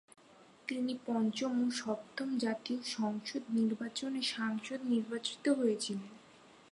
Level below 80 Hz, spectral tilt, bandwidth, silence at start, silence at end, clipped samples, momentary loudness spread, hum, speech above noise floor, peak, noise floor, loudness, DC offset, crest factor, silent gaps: -82 dBFS; -4 dB/octave; 11.5 kHz; 0.4 s; 0.15 s; under 0.1%; 6 LU; none; 26 dB; -20 dBFS; -61 dBFS; -36 LUFS; under 0.1%; 16 dB; none